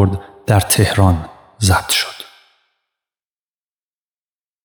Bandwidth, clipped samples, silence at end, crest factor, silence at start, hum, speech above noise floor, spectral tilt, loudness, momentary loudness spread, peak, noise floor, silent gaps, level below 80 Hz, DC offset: over 20 kHz; under 0.1%; 2.4 s; 18 dB; 0 s; none; over 76 dB; -4.5 dB/octave; -15 LUFS; 20 LU; 0 dBFS; under -90 dBFS; none; -42 dBFS; under 0.1%